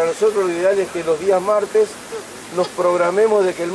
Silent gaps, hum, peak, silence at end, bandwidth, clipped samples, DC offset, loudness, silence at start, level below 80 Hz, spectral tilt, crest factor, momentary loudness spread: none; none; -4 dBFS; 0 s; 11 kHz; under 0.1%; under 0.1%; -18 LUFS; 0 s; -60 dBFS; -4.5 dB/octave; 14 dB; 10 LU